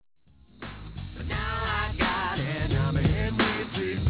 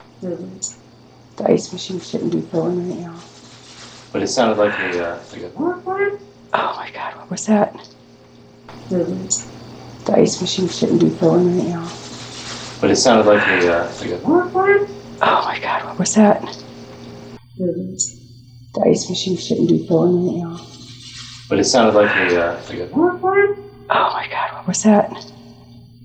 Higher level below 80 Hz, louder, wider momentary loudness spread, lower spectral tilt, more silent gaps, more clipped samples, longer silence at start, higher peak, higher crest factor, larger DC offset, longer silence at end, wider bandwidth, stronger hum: first, -36 dBFS vs -54 dBFS; second, -27 LUFS vs -18 LUFS; second, 15 LU vs 20 LU; first, -10 dB/octave vs -4.5 dB/octave; neither; neither; first, 0.6 s vs 0.2 s; second, -12 dBFS vs 0 dBFS; about the same, 16 dB vs 18 dB; neither; second, 0 s vs 0.2 s; second, 4 kHz vs 9.2 kHz; neither